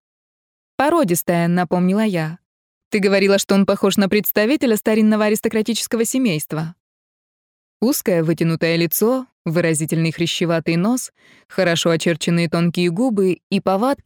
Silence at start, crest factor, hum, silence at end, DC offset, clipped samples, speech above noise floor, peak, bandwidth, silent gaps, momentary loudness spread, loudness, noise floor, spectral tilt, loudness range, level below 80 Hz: 0.8 s; 14 dB; none; 0.1 s; under 0.1%; under 0.1%; over 72 dB; -4 dBFS; 19.5 kHz; 2.45-2.91 s, 6.80-7.80 s, 9.32-9.45 s, 11.45-11.49 s, 13.43-13.50 s; 7 LU; -18 LUFS; under -90 dBFS; -5 dB/octave; 4 LU; -60 dBFS